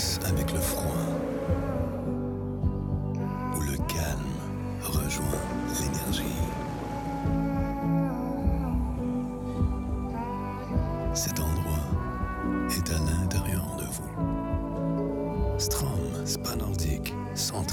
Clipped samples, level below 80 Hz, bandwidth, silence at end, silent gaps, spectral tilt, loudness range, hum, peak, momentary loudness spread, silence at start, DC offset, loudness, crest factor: under 0.1%; -36 dBFS; 18 kHz; 0 s; none; -5 dB/octave; 1 LU; none; -14 dBFS; 5 LU; 0 s; under 0.1%; -30 LUFS; 14 dB